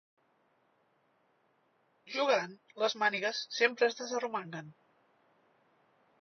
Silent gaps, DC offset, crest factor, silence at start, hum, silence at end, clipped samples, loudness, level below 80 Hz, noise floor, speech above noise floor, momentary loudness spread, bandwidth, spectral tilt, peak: none; under 0.1%; 22 dB; 2.05 s; none; 1.5 s; under 0.1%; -32 LUFS; under -90 dBFS; -73 dBFS; 40 dB; 13 LU; 6.4 kHz; -0.5 dB/octave; -14 dBFS